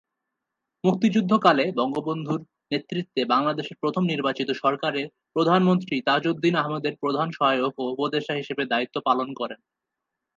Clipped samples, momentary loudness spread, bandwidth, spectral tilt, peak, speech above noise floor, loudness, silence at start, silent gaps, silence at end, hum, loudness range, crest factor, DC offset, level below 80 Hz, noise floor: under 0.1%; 10 LU; 7.6 kHz; -6.5 dB/octave; -4 dBFS; 60 dB; -24 LUFS; 0.85 s; none; 0.8 s; none; 3 LU; 20 dB; under 0.1%; -74 dBFS; -84 dBFS